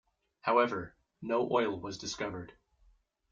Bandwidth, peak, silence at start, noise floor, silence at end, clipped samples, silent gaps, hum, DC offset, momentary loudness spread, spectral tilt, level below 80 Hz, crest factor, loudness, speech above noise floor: 7.6 kHz; -14 dBFS; 0.45 s; -68 dBFS; 0.8 s; under 0.1%; none; none; under 0.1%; 17 LU; -4.5 dB/octave; -66 dBFS; 20 dB; -33 LUFS; 35 dB